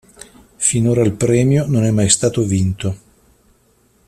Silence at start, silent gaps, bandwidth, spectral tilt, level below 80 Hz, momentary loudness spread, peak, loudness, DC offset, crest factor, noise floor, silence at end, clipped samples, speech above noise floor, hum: 0.6 s; none; 14 kHz; -5 dB/octave; -46 dBFS; 8 LU; 0 dBFS; -16 LUFS; under 0.1%; 18 dB; -56 dBFS; 1.1 s; under 0.1%; 41 dB; none